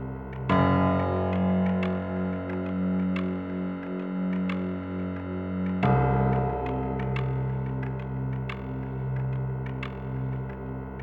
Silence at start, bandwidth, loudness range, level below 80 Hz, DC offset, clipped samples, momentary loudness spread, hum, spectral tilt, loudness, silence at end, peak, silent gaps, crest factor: 0 s; 4.7 kHz; 5 LU; -44 dBFS; under 0.1%; under 0.1%; 10 LU; none; -10 dB/octave; -28 LUFS; 0 s; -10 dBFS; none; 18 dB